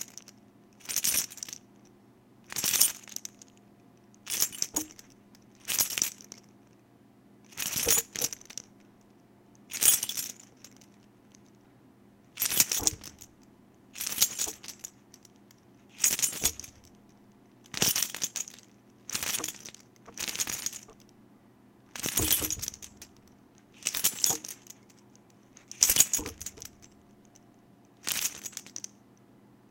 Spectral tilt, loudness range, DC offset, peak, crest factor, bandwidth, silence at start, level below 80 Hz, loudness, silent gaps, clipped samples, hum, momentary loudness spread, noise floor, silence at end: 0 dB/octave; 5 LU; under 0.1%; 0 dBFS; 34 dB; 17 kHz; 0 s; -60 dBFS; -28 LUFS; none; under 0.1%; none; 23 LU; -59 dBFS; 0.9 s